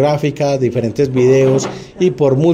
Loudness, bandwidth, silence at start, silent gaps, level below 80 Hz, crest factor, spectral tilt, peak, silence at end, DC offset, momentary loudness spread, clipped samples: -14 LUFS; 9.8 kHz; 0 s; none; -48 dBFS; 12 dB; -7 dB/octave; -2 dBFS; 0 s; under 0.1%; 6 LU; under 0.1%